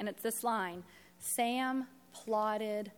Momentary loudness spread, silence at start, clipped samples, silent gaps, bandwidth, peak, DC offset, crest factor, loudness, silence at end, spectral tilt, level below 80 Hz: 13 LU; 0 s; under 0.1%; none; 19.5 kHz; -20 dBFS; under 0.1%; 16 dB; -35 LUFS; 0.05 s; -3 dB/octave; -80 dBFS